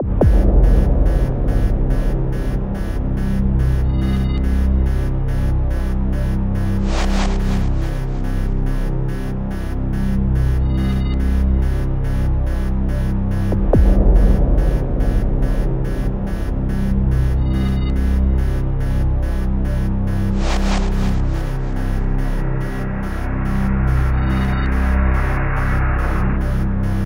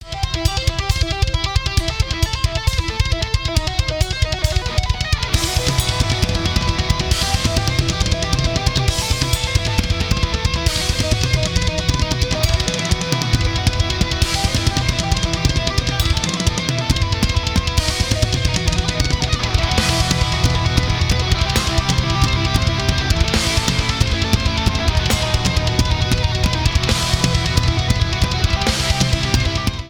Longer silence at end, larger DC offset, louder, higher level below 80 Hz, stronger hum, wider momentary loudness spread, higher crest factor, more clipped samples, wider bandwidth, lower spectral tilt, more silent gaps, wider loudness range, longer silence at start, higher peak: about the same, 0 s vs 0 s; neither; about the same, -20 LUFS vs -18 LUFS; about the same, -18 dBFS vs -22 dBFS; neither; first, 7 LU vs 3 LU; about the same, 14 dB vs 16 dB; neither; second, 11 kHz vs 20 kHz; first, -8 dB/octave vs -4 dB/octave; neither; about the same, 3 LU vs 2 LU; about the same, 0 s vs 0 s; about the same, -2 dBFS vs 0 dBFS